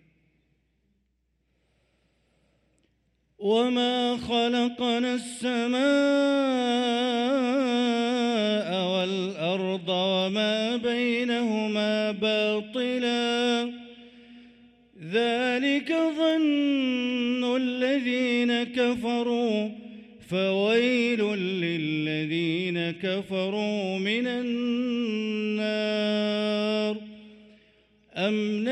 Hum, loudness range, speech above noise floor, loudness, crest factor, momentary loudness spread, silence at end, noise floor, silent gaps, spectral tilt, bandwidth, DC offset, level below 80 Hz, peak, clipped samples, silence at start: none; 4 LU; 47 dB; -26 LUFS; 14 dB; 5 LU; 0 s; -73 dBFS; none; -5 dB/octave; 11 kHz; under 0.1%; -68 dBFS; -12 dBFS; under 0.1%; 3.4 s